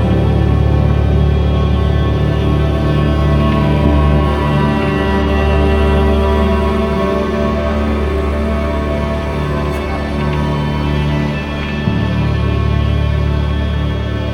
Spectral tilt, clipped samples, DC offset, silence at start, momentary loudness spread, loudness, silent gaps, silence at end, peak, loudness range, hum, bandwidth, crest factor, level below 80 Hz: -8 dB/octave; under 0.1%; under 0.1%; 0 s; 5 LU; -15 LUFS; none; 0 s; 0 dBFS; 4 LU; none; 10 kHz; 12 dB; -18 dBFS